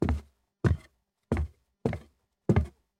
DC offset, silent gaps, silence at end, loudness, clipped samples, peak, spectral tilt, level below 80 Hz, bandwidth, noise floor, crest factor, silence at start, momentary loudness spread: under 0.1%; none; 0.3 s; -32 LUFS; under 0.1%; -10 dBFS; -9 dB/octave; -38 dBFS; 10 kHz; -63 dBFS; 20 dB; 0 s; 9 LU